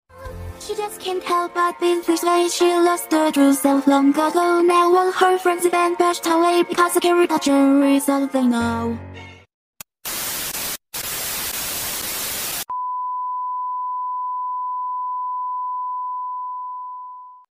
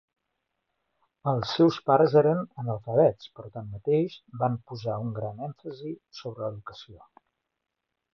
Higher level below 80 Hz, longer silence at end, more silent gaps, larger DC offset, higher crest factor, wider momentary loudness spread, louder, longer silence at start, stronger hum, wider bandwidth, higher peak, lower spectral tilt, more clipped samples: first, -52 dBFS vs -64 dBFS; second, 0.15 s vs 1.2 s; first, 9.54-9.73 s vs none; neither; about the same, 20 dB vs 20 dB; second, 12 LU vs 19 LU; first, -20 LUFS vs -26 LUFS; second, 0.15 s vs 1.25 s; neither; first, 16 kHz vs 6.6 kHz; first, 0 dBFS vs -8 dBFS; second, -3 dB/octave vs -8 dB/octave; neither